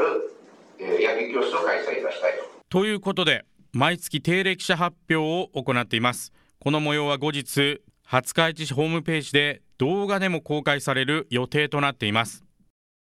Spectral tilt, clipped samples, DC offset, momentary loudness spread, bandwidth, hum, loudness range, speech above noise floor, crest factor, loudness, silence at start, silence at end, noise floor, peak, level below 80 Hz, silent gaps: -4.5 dB/octave; under 0.1%; under 0.1%; 5 LU; 15 kHz; none; 1 LU; 25 dB; 22 dB; -24 LUFS; 0 s; 0.7 s; -49 dBFS; -2 dBFS; -64 dBFS; none